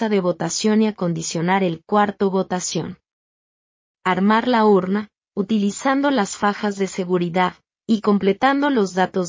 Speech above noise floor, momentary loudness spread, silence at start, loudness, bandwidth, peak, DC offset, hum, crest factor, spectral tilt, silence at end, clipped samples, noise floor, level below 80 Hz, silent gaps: over 71 dB; 8 LU; 0 s; -20 LUFS; 7.6 kHz; -4 dBFS; under 0.1%; none; 16 dB; -5 dB/octave; 0 s; under 0.1%; under -90 dBFS; -62 dBFS; 3.13-3.95 s